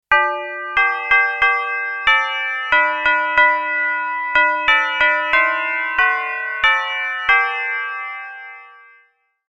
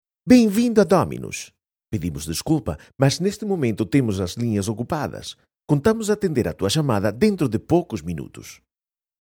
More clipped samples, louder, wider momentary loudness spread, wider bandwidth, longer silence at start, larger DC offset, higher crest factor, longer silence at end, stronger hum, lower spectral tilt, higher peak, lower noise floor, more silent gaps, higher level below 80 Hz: neither; first, -16 LUFS vs -21 LUFS; second, 9 LU vs 15 LU; second, 9 kHz vs 19 kHz; second, 0.1 s vs 0.25 s; neither; about the same, 18 dB vs 18 dB; first, 0.8 s vs 0.65 s; neither; second, -1.5 dB/octave vs -6 dB/octave; about the same, 0 dBFS vs -2 dBFS; second, -58 dBFS vs under -90 dBFS; neither; about the same, -50 dBFS vs -48 dBFS